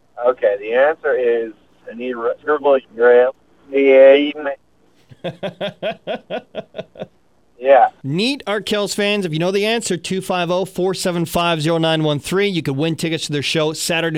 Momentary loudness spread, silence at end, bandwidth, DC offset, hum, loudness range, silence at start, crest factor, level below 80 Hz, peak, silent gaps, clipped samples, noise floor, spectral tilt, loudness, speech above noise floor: 16 LU; 0 s; 16 kHz; 0.1%; none; 5 LU; 0.15 s; 18 dB; -56 dBFS; 0 dBFS; none; under 0.1%; -56 dBFS; -4.5 dB/octave; -17 LUFS; 39 dB